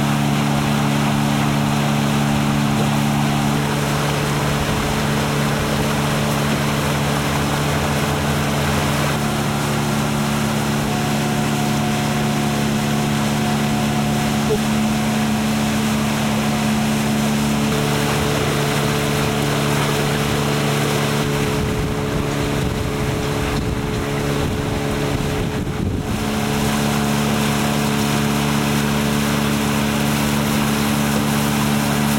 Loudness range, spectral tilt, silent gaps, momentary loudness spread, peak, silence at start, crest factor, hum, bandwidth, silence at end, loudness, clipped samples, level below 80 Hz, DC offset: 3 LU; -5 dB/octave; none; 3 LU; -6 dBFS; 0 s; 14 dB; none; 16.5 kHz; 0 s; -19 LUFS; under 0.1%; -36 dBFS; under 0.1%